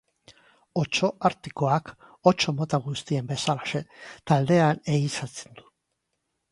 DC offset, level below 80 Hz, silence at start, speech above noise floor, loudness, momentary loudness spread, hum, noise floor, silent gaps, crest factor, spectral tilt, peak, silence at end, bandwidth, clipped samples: under 0.1%; -62 dBFS; 0.3 s; 53 dB; -25 LUFS; 12 LU; none; -79 dBFS; none; 22 dB; -5.5 dB/octave; -4 dBFS; 1.1 s; 11.5 kHz; under 0.1%